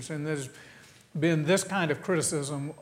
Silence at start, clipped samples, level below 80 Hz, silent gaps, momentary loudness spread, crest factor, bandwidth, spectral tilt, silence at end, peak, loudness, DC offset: 0 s; under 0.1%; -68 dBFS; none; 14 LU; 18 dB; 16 kHz; -4.5 dB/octave; 0 s; -12 dBFS; -28 LUFS; under 0.1%